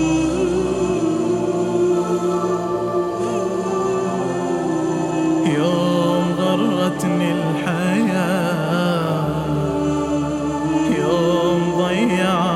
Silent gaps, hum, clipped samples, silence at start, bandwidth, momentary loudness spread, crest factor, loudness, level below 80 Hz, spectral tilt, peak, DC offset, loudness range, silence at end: none; none; under 0.1%; 0 s; 14.5 kHz; 4 LU; 14 dB; -19 LUFS; -44 dBFS; -6.5 dB/octave; -4 dBFS; under 0.1%; 2 LU; 0 s